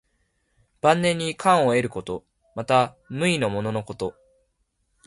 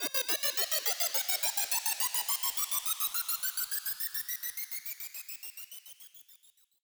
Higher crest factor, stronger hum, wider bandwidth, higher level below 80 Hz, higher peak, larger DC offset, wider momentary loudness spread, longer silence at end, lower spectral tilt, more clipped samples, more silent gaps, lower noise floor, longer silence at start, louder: about the same, 20 dB vs 20 dB; neither; second, 11.5 kHz vs over 20 kHz; first, -58 dBFS vs -80 dBFS; first, -4 dBFS vs -14 dBFS; neither; about the same, 14 LU vs 14 LU; first, 0.95 s vs 0.45 s; first, -5 dB/octave vs 3 dB/octave; neither; neither; first, -72 dBFS vs -63 dBFS; first, 0.85 s vs 0 s; first, -23 LUFS vs -30 LUFS